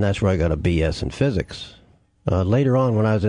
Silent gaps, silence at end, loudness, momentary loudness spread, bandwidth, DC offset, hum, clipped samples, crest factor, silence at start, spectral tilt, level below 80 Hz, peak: none; 0 s; -21 LUFS; 13 LU; 10.5 kHz; under 0.1%; none; under 0.1%; 12 dB; 0 s; -7.5 dB/octave; -38 dBFS; -8 dBFS